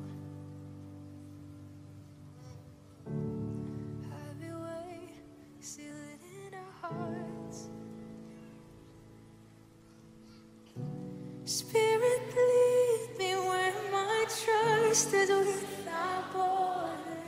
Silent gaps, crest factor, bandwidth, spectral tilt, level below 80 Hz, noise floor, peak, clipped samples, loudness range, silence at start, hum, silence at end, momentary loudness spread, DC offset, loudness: none; 20 dB; 16 kHz; -3.5 dB/octave; -68 dBFS; -57 dBFS; -14 dBFS; under 0.1%; 19 LU; 0 s; none; 0 s; 24 LU; under 0.1%; -31 LUFS